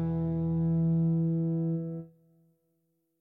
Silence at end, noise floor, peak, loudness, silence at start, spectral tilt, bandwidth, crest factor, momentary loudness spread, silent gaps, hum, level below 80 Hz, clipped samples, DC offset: 1.15 s; -76 dBFS; -20 dBFS; -29 LUFS; 0 s; -14 dB/octave; 1.7 kHz; 10 dB; 9 LU; none; none; -54 dBFS; under 0.1%; under 0.1%